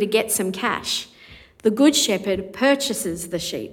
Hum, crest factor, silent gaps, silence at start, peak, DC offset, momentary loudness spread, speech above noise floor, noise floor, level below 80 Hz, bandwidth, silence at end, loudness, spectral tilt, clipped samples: none; 18 dB; none; 0 s; -4 dBFS; under 0.1%; 10 LU; 26 dB; -47 dBFS; -54 dBFS; 19 kHz; 0 s; -21 LUFS; -3 dB/octave; under 0.1%